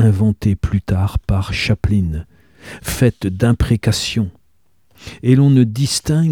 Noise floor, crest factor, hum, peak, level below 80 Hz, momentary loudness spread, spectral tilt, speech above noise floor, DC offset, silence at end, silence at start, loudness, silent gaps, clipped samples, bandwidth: -64 dBFS; 14 dB; none; -2 dBFS; -30 dBFS; 12 LU; -6 dB/octave; 48 dB; 0.2%; 0 s; 0 s; -17 LUFS; none; under 0.1%; 17.5 kHz